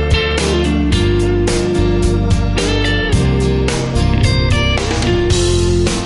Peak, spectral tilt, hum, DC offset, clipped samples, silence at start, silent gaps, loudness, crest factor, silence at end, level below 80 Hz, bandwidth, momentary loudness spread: -2 dBFS; -5.5 dB/octave; none; under 0.1%; under 0.1%; 0 s; none; -14 LUFS; 12 dB; 0 s; -20 dBFS; 11.5 kHz; 2 LU